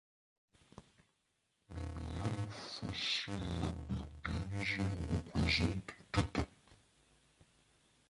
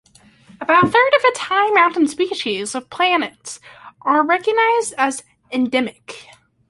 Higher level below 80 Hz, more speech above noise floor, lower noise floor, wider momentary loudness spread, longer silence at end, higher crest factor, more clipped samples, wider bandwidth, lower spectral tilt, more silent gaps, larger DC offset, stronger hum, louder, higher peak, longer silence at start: first, -50 dBFS vs -62 dBFS; first, 44 dB vs 32 dB; first, -81 dBFS vs -49 dBFS; second, 11 LU vs 19 LU; first, 1.35 s vs 0.45 s; first, 26 dB vs 16 dB; neither; about the same, 11.5 kHz vs 11.5 kHz; first, -5 dB/octave vs -3.5 dB/octave; neither; neither; neither; second, -39 LUFS vs -17 LUFS; second, -16 dBFS vs -2 dBFS; first, 0.8 s vs 0.6 s